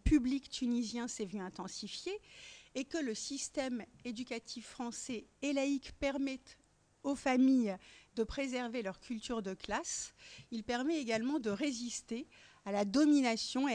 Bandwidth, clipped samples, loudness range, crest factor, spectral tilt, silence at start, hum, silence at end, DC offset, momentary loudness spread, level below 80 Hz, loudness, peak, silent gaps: 10.5 kHz; under 0.1%; 6 LU; 18 dB; -4 dB/octave; 0.05 s; none; 0 s; under 0.1%; 15 LU; -54 dBFS; -37 LUFS; -18 dBFS; none